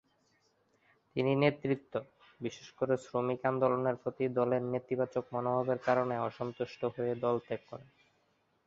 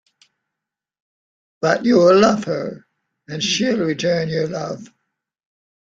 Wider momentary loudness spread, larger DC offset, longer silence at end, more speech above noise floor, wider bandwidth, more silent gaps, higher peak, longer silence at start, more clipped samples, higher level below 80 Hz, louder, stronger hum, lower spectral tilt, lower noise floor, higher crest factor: second, 12 LU vs 17 LU; neither; second, 0.85 s vs 1.1 s; second, 41 dB vs 67 dB; second, 7.8 kHz vs 9 kHz; neither; second, -12 dBFS vs -2 dBFS; second, 1.15 s vs 1.6 s; neither; second, -74 dBFS vs -60 dBFS; second, -34 LUFS vs -18 LUFS; neither; first, -7.5 dB/octave vs -5 dB/octave; second, -74 dBFS vs -84 dBFS; about the same, 22 dB vs 18 dB